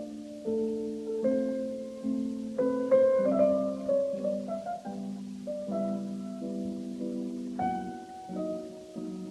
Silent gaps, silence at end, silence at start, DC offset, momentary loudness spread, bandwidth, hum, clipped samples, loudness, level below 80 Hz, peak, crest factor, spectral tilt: none; 0 s; 0 s; under 0.1%; 14 LU; 12 kHz; none; under 0.1%; -32 LUFS; -68 dBFS; -14 dBFS; 18 dB; -7.5 dB/octave